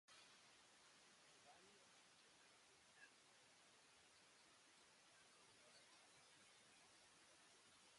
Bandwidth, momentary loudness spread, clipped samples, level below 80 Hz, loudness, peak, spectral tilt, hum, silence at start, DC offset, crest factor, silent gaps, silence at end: 11.5 kHz; 2 LU; under 0.1%; under -90 dBFS; -69 LUFS; -54 dBFS; -1 dB/octave; none; 0.05 s; under 0.1%; 16 dB; none; 0 s